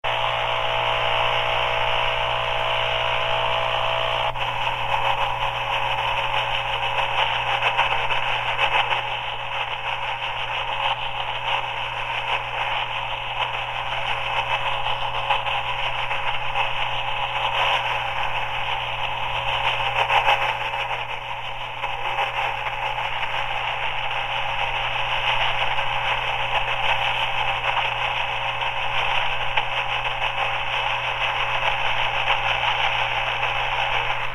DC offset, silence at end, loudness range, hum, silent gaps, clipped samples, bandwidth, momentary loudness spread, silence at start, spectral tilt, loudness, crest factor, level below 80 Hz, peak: under 0.1%; 0 s; 3 LU; none; none; under 0.1%; 14.5 kHz; 5 LU; 0.05 s; -2.5 dB/octave; -23 LUFS; 18 dB; -40 dBFS; -4 dBFS